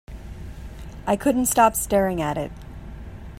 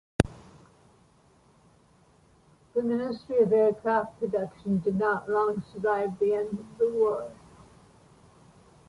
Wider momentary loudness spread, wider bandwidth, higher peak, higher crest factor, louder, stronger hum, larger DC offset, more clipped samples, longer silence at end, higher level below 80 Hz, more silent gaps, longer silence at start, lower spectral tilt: first, 22 LU vs 7 LU; first, 16 kHz vs 11.5 kHz; about the same, -2 dBFS vs -4 dBFS; about the same, 22 dB vs 24 dB; first, -21 LUFS vs -28 LUFS; neither; neither; neither; second, 0 s vs 1.55 s; first, -40 dBFS vs -54 dBFS; neither; about the same, 0.1 s vs 0.2 s; second, -4.5 dB/octave vs -7 dB/octave